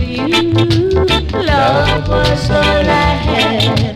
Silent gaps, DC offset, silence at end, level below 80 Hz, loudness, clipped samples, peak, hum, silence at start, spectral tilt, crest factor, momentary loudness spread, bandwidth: none; under 0.1%; 0 s; -22 dBFS; -12 LUFS; under 0.1%; 0 dBFS; none; 0 s; -6 dB/octave; 12 dB; 2 LU; 14 kHz